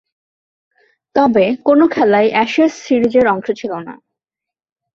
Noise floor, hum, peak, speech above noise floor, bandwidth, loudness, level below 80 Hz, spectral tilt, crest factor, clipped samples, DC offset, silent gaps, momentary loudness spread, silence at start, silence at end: -86 dBFS; none; -2 dBFS; 73 dB; 7.4 kHz; -14 LUFS; -56 dBFS; -6 dB/octave; 14 dB; under 0.1%; under 0.1%; none; 10 LU; 1.15 s; 1 s